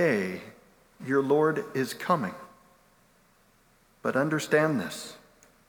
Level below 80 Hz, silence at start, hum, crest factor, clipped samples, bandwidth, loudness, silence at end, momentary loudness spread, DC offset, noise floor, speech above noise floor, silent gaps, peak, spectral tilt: -70 dBFS; 0 s; none; 20 dB; under 0.1%; 19.5 kHz; -28 LUFS; 0.5 s; 18 LU; under 0.1%; -63 dBFS; 36 dB; none; -10 dBFS; -5.5 dB/octave